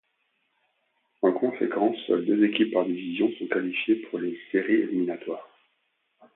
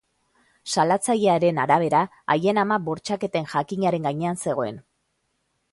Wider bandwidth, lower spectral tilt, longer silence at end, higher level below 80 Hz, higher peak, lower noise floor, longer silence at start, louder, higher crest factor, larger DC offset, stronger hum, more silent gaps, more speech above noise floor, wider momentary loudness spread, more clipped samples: second, 4 kHz vs 11.5 kHz; first, -10 dB/octave vs -5 dB/octave; about the same, 0.9 s vs 0.9 s; second, -78 dBFS vs -66 dBFS; second, -10 dBFS vs -4 dBFS; about the same, -74 dBFS vs -73 dBFS; first, 1.2 s vs 0.65 s; second, -26 LUFS vs -23 LUFS; about the same, 18 dB vs 18 dB; neither; neither; neither; about the same, 48 dB vs 51 dB; about the same, 9 LU vs 8 LU; neither